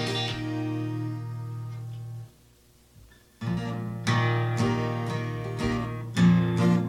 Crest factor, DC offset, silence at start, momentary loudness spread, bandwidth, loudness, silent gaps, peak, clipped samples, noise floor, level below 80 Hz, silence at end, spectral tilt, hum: 18 dB; under 0.1%; 0 s; 15 LU; 12 kHz; -28 LUFS; none; -10 dBFS; under 0.1%; -58 dBFS; -52 dBFS; 0 s; -6.5 dB/octave; 60 Hz at -55 dBFS